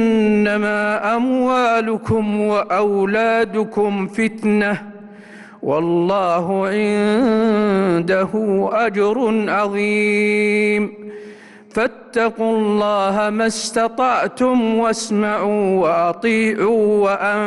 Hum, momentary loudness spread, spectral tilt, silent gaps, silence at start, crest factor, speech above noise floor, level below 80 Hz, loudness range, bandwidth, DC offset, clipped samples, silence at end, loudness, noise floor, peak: none; 4 LU; -5.5 dB/octave; none; 0 s; 10 dB; 23 dB; -54 dBFS; 2 LU; 12 kHz; under 0.1%; under 0.1%; 0 s; -17 LUFS; -40 dBFS; -8 dBFS